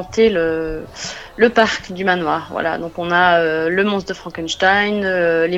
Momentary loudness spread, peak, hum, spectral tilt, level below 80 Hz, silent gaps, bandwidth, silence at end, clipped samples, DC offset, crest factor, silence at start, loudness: 13 LU; 0 dBFS; none; -4.5 dB/octave; -44 dBFS; none; 8.4 kHz; 0 s; under 0.1%; under 0.1%; 18 dB; 0 s; -17 LUFS